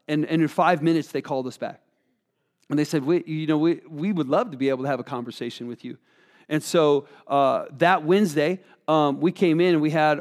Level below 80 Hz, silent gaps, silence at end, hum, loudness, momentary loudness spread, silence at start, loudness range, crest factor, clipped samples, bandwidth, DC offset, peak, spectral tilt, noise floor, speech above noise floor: -82 dBFS; none; 0 s; none; -23 LUFS; 13 LU; 0.1 s; 5 LU; 18 dB; under 0.1%; 14.5 kHz; under 0.1%; -4 dBFS; -6.5 dB/octave; -74 dBFS; 51 dB